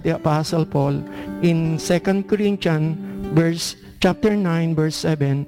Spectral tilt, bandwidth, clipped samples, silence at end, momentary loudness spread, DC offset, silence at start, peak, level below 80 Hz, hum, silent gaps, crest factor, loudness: -6.5 dB/octave; 16 kHz; under 0.1%; 0 s; 6 LU; under 0.1%; 0 s; -8 dBFS; -46 dBFS; none; none; 12 dB; -20 LUFS